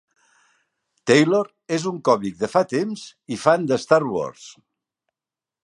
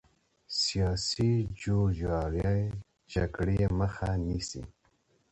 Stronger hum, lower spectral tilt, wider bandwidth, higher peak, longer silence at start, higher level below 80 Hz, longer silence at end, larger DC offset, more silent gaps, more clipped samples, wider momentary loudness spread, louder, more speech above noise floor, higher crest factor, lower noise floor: neither; about the same, -5 dB/octave vs -5.5 dB/octave; first, 11.5 kHz vs 8.8 kHz; first, -2 dBFS vs -16 dBFS; first, 1.05 s vs 0.5 s; second, -66 dBFS vs -42 dBFS; first, 1.15 s vs 0.6 s; neither; neither; neither; first, 13 LU vs 8 LU; first, -21 LUFS vs -31 LUFS; first, 69 dB vs 41 dB; first, 22 dB vs 14 dB; first, -90 dBFS vs -70 dBFS